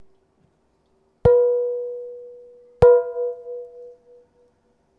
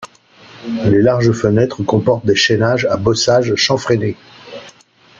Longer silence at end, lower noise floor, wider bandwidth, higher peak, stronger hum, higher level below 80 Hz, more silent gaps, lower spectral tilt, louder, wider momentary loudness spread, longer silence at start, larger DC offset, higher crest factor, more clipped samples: first, 1.1 s vs 0.5 s; first, -65 dBFS vs -43 dBFS; second, 5 kHz vs 7.6 kHz; about the same, 0 dBFS vs 0 dBFS; neither; about the same, -42 dBFS vs -46 dBFS; neither; first, -9 dB/octave vs -5 dB/octave; second, -19 LUFS vs -14 LUFS; about the same, 22 LU vs 20 LU; first, 1.25 s vs 0 s; neither; first, 22 dB vs 14 dB; neither